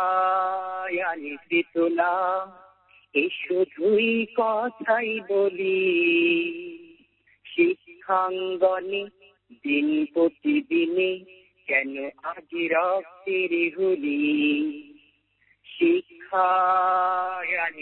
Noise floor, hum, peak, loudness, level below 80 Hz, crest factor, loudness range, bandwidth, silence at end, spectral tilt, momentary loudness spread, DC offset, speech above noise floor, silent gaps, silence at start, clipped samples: -65 dBFS; none; -8 dBFS; -24 LUFS; -72 dBFS; 16 dB; 3 LU; 4.2 kHz; 0 s; -9 dB/octave; 11 LU; under 0.1%; 41 dB; none; 0 s; under 0.1%